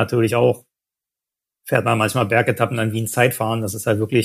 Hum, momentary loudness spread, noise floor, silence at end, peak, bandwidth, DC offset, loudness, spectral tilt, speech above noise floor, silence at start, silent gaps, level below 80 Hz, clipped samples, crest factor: none; 5 LU; -88 dBFS; 0 s; -2 dBFS; 15.5 kHz; under 0.1%; -19 LUFS; -5.5 dB/octave; 69 dB; 0 s; none; -60 dBFS; under 0.1%; 18 dB